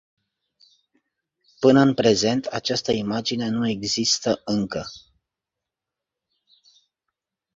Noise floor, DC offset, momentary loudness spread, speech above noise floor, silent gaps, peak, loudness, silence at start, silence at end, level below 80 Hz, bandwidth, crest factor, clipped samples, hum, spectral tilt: -86 dBFS; under 0.1%; 9 LU; 65 dB; none; -4 dBFS; -21 LUFS; 1.6 s; 2.55 s; -58 dBFS; 7.8 kHz; 22 dB; under 0.1%; none; -4.5 dB/octave